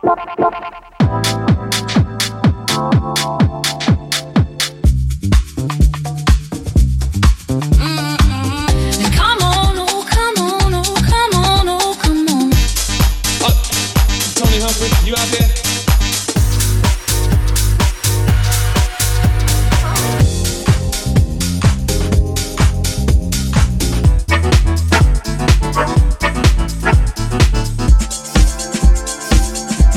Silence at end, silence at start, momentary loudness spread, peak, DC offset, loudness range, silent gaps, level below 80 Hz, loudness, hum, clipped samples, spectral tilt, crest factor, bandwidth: 0 s; 0.05 s; 4 LU; 0 dBFS; under 0.1%; 2 LU; none; -16 dBFS; -15 LUFS; none; under 0.1%; -4.5 dB/octave; 14 dB; 17.5 kHz